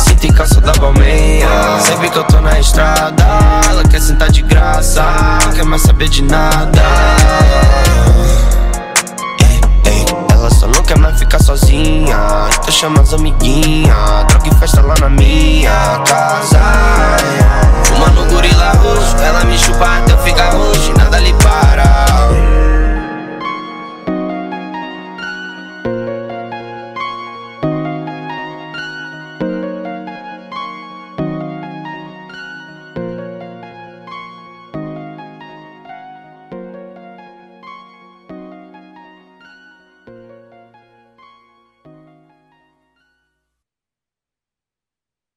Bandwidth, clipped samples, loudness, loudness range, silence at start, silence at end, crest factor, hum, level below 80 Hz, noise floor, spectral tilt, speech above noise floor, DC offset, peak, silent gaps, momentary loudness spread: 16 kHz; under 0.1%; -10 LUFS; 18 LU; 0 s; 6.9 s; 10 dB; none; -12 dBFS; -89 dBFS; -4.5 dB/octave; 82 dB; under 0.1%; 0 dBFS; none; 18 LU